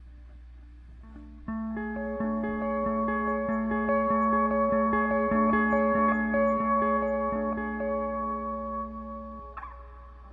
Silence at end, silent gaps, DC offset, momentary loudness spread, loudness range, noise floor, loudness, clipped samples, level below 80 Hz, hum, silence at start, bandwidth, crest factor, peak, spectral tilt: 0 s; none; under 0.1%; 17 LU; 7 LU; -47 dBFS; -27 LUFS; under 0.1%; -46 dBFS; none; 0 s; 3.6 kHz; 14 dB; -14 dBFS; -10 dB/octave